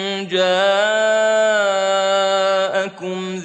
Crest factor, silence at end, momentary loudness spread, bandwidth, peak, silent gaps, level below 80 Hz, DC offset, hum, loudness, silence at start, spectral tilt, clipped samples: 12 dB; 0 s; 7 LU; 9 kHz; -4 dBFS; none; -72 dBFS; under 0.1%; none; -17 LUFS; 0 s; -3 dB/octave; under 0.1%